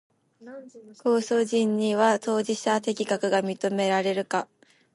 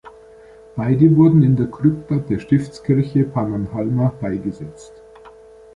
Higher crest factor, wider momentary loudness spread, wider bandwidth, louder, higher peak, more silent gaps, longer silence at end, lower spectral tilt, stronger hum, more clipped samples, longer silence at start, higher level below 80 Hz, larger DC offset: about the same, 16 dB vs 16 dB; first, 19 LU vs 14 LU; first, 11.5 kHz vs 9.4 kHz; second, -25 LUFS vs -18 LUFS; second, -10 dBFS vs -2 dBFS; neither; about the same, 0.5 s vs 0.45 s; second, -4.5 dB/octave vs -10 dB/octave; neither; neither; first, 0.4 s vs 0.05 s; second, -76 dBFS vs -48 dBFS; neither